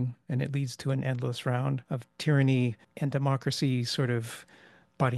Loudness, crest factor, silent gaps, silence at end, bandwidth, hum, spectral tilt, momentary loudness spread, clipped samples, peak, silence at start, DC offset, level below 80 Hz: -30 LUFS; 18 dB; none; 0 s; 12.5 kHz; none; -6.5 dB/octave; 8 LU; under 0.1%; -12 dBFS; 0 s; under 0.1%; -68 dBFS